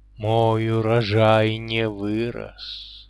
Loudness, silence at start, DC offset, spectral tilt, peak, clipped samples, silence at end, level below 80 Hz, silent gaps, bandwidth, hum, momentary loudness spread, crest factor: -21 LUFS; 0.2 s; under 0.1%; -7.5 dB/octave; -6 dBFS; under 0.1%; 0.1 s; -48 dBFS; none; 11 kHz; none; 16 LU; 16 dB